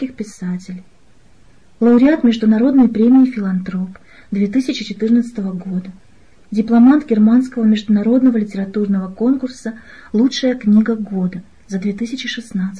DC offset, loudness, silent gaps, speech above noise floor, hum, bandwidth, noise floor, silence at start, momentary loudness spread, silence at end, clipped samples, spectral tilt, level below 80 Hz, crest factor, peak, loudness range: 0.5%; -15 LUFS; none; 36 dB; none; 10 kHz; -51 dBFS; 0 s; 15 LU; 0 s; under 0.1%; -7 dB/octave; -52 dBFS; 12 dB; -4 dBFS; 4 LU